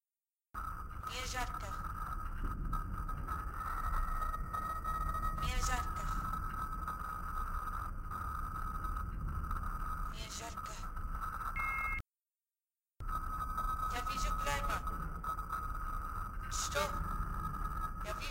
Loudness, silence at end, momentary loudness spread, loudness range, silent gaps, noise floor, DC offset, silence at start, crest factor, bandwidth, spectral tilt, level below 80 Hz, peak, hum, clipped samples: -40 LUFS; 0 s; 7 LU; 3 LU; none; under -90 dBFS; under 0.1%; 0.55 s; 18 dB; 16 kHz; -4 dB/octave; -42 dBFS; -20 dBFS; none; under 0.1%